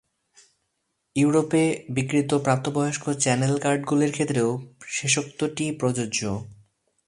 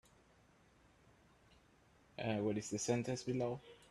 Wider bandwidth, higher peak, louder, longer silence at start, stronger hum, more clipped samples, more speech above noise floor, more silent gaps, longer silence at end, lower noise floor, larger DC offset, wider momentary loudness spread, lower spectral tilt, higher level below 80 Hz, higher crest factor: about the same, 11.5 kHz vs 12.5 kHz; first, -4 dBFS vs -22 dBFS; first, -24 LUFS vs -40 LUFS; second, 1.15 s vs 2.2 s; neither; neither; first, 53 dB vs 30 dB; neither; first, 0.55 s vs 0.15 s; first, -76 dBFS vs -69 dBFS; neither; about the same, 7 LU vs 9 LU; about the same, -5 dB/octave vs -5 dB/octave; first, -60 dBFS vs -72 dBFS; about the same, 20 dB vs 22 dB